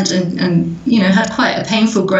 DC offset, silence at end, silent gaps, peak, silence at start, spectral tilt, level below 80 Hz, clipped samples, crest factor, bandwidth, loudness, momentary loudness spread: under 0.1%; 0 s; none; -2 dBFS; 0 s; -5 dB/octave; -48 dBFS; under 0.1%; 12 dB; 8.2 kHz; -14 LUFS; 4 LU